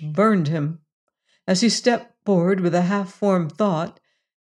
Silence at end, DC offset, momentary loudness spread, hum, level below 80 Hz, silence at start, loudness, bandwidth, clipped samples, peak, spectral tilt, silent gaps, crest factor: 0.55 s; under 0.1%; 10 LU; none; -72 dBFS; 0 s; -21 LUFS; 11 kHz; under 0.1%; -4 dBFS; -5.5 dB/octave; 0.93-1.07 s; 16 dB